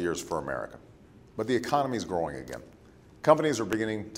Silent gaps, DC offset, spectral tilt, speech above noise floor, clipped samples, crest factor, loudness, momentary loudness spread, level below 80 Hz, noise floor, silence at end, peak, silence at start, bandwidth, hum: none; under 0.1%; -5 dB/octave; 25 dB; under 0.1%; 24 dB; -29 LUFS; 18 LU; -58 dBFS; -54 dBFS; 0 s; -6 dBFS; 0 s; 16 kHz; none